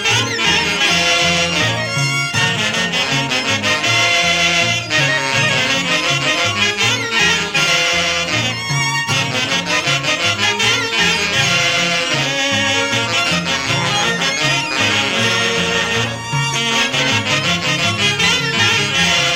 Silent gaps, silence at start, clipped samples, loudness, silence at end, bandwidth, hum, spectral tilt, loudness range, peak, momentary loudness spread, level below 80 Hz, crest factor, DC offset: none; 0 s; under 0.1%; -14 LUFS; 0 s; 16.5 kHz; none; -2.5 dB/octave; 1 LU; 0 dBFS; 4 LU; -46 dBFS; 16 dB; under 0.1%